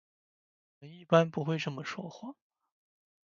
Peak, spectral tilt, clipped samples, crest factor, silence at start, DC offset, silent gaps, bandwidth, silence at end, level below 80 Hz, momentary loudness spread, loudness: -8 dBFS; -6.5 dB/octave; under 0.1%; 26 dB; 0.8 s; under 0.1%; none; 7.4 kHz; 0.95 s; -78 dBFS; 19 LU; -31 LUFS